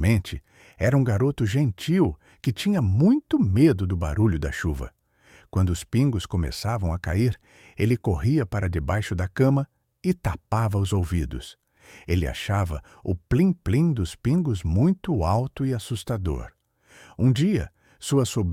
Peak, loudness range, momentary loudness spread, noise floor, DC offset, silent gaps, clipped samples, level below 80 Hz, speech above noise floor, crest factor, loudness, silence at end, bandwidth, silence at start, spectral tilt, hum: -8 dBFS; 4 LU; 10 LU; -55 dBFS; under 0.1%; none; under 0.1%; -38 dBFS; 33 dB; 16 dB; -24 LUFS; 0 s; 15.5 kHz; 0 s; -7 dB/octave; none